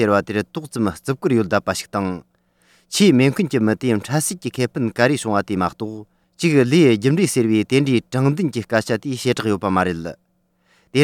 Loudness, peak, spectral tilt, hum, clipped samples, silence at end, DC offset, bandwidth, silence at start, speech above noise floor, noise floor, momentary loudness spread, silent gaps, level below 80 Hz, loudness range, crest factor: -19 LUFS; -2 dBFS; -5.5 dB/octave; none; under 0.1%; 0 s; under 0.1%; 17.5 kHz; 0 s; 44 dB; -63 dBFS; 10 LU; none; -56 dBFS; 3 LU; 16 dB